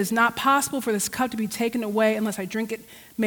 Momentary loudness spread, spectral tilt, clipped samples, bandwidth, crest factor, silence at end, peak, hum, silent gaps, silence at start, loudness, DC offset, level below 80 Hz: 9 LU; -3.5 dB/octave; under 0.1%; over 20 kHz; 16 dB; 0 s; -8 dBFS; none; none; 0 s; -24 LUFS; under 0.1%; -62 dBFS